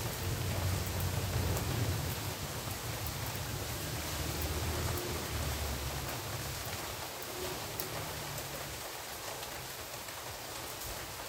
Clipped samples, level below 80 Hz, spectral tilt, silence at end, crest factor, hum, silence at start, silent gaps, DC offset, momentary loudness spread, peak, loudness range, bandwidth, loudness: under 0.1%; -48 dBFS; -3.5 dB/octave; 0 s; 20 dB; none; 0 s; none; under 0.1%; 6 LU; -16 dBFS; 4 LU; 16 kHz; -37 LUFS